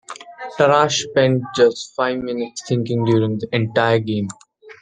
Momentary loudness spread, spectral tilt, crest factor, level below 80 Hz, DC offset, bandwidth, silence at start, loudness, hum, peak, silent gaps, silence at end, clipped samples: 10 LU; -5 dB/octave; 18 dB; -58 dBFS; under 0.1%; 9.6 kHz; 0.1 s; -18 LUFS; none; -2 dBFS; none; 0.1 s; under 0.1%